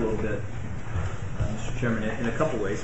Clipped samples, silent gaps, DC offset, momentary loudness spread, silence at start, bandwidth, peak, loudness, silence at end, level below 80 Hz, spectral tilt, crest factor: under 0.1%; none; 2%; 7 LU; 0 s; 8.2 kHz; -10 dBFS; -30 LUFS; 0 s; -36 dBFS; -6.5 dB/octave; 18 dB